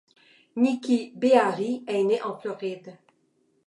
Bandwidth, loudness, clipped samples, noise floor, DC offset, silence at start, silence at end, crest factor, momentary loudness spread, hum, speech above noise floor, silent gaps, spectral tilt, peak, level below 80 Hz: 11 kHz; -25 LUFS; under 0.1%; -68 dBFS; under 0.1%; 0.55 s; 0.75 s; 22 dB; 14 LU; none; 44 dB; none; -5.5 dB/octave; -4 dBFS; -82 dBFS